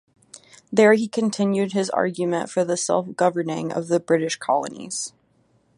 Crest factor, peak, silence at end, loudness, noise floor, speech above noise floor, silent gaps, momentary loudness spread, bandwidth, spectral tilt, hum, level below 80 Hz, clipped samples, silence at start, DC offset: 20 dB; -2 dBFS; 0.7 s; -22 LUFS; -63 dBFS; 41 dB; none; 11 LU; 11.5 kHz; -4.5 dB/octave; none; -70 dBFS; under 0.1%; 0.7 s; under 0.1%